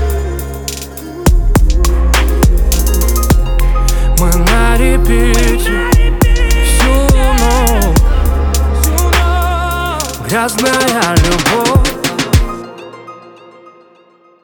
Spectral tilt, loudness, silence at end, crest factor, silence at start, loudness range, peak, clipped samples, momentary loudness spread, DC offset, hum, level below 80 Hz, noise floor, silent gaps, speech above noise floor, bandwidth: -4.5 dB/octave; -12 LUFS; 1.25 s; 10 dB; 0 s; 2 LU; 0 dBFS; under 0.1%; 9 LU; under 0.1%; none; -12 dBFS; -46 dBFS; none; 35 dB; 19.5 kHz